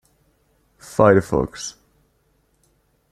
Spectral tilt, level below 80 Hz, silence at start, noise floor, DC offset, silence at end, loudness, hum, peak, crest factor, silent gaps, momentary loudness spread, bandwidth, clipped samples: -6 dB/octave; -46 dBFS; 0.9 s; -64 dBFS; under 0.1%; 1.4 s; -19 LUFS; none; -2 dBFS; 20 dB; none; 18 LU; 14 kHz; under 0.1%